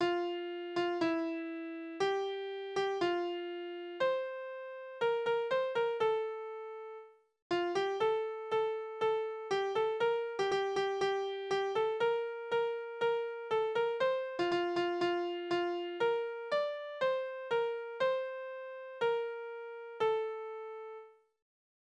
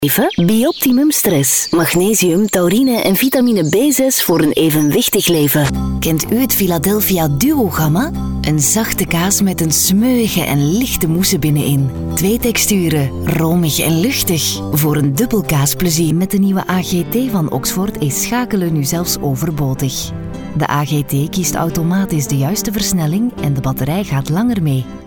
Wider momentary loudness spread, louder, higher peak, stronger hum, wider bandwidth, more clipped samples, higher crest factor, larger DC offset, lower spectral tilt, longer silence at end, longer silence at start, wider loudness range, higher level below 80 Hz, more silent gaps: first, 11 LU vs 5 LU; second, -35 LUFS vs -14 LUFS; second, -20 dBFS vs -2 dBFS; neither; second, 8.8 kHz vs over 20 kHz; neither; about the same, 14 dB vs 12 dB; neither; about the same, -4.5 dB/octave vs -4.5 dB/octave; first, 0.9 s vs 0 s; about the same, 0 s vs 0 s; about the same, 3 LU vs 5 LU; second, -78 dBFS vs -34 dBFS; first, 7.42-7.50 s vs none